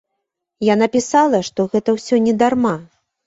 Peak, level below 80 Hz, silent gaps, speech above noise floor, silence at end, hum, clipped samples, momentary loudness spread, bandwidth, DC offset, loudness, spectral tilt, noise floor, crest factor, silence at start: -2 dBFS; -56 dBFS; none; 61 dB; 0.4 s; none; under 0.1%; 6 LU; 8 kHz; under 0.1%; -17 LUFS; -5.5 dB/octave; -77 dBFS; 16 dB; 0.6 s